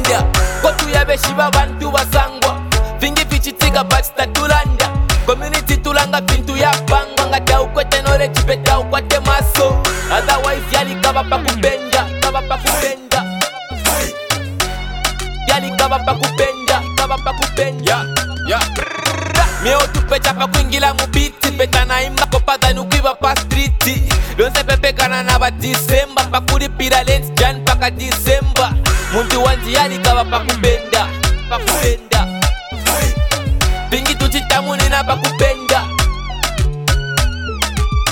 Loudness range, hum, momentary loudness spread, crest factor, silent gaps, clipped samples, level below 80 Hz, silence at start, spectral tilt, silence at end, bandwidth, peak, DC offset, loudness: 2 LU; none; 4 LU; 14 dB; none; under 0.1%; -20 dBFS; 0 s; -3.5 dB/octave; 0 s; 19.5 kHz; 0 dBFS; 0.1%; -15 LUFS